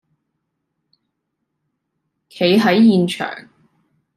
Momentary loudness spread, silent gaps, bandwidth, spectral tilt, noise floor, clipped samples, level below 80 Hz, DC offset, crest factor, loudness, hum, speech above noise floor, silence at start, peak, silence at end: 15 LU; none; 13.5 kHz; -6.5 dB/octave; -75 dBFS; under 0.1%; -66 dBFS; under 0.1%; 16 dB; -15 LUFS; none; 61 dB; 2.35 s; -4 dBFS; 0.75 s